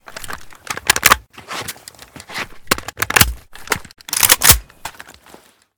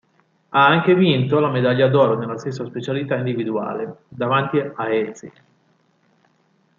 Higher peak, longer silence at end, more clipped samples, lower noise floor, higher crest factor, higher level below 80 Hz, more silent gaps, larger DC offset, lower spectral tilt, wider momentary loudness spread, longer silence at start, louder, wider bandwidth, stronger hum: about the same, 0 dBFS vs -2 dBFS; second, 0.85 s vs 1.5 s; first, 0.2% vs under 0.1%; second, -46 dBFS vs -62 dBFS; about the same, 20 dB vs 18 dB; first, -34 dBFS vs -64 dBFS; neither; neither; second, -1 dB/octave vs -7.5 dB/octave; first, 23 LU vs 13 LU; second, 0.1 s vs 0.5 s; first, -14 LUFS vs -19 LUFS; first, over 20 kHz vs 7.4 kHz; neither